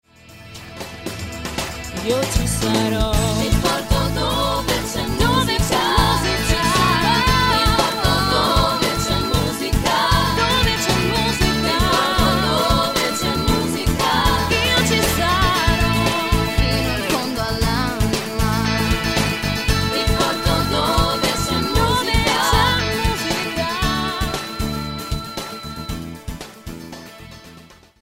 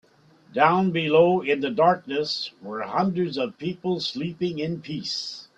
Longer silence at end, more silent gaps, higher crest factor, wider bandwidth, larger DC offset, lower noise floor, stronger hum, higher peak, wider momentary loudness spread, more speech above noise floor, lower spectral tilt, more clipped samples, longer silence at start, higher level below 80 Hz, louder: first, 0.4 s vs 0.15 s; neither; about the same, 18 dB vs 20 dB; first, 16.5 kHz vs 8.2 kHz; neither; second, -45 dBFS vs -56 dBFS; neither; first, 0 dBFS vs -4 dBFS; about the same, 13 LU vs 11 LU; second, 26 dB vs 32 dB; second, -4 dB/octave vs -6 dB/octave; neither; second, 0.3 s vs 0.5 s; first, -28 dBFS vs -66 dBFS; first, -18 LUFS vs -24 LUFS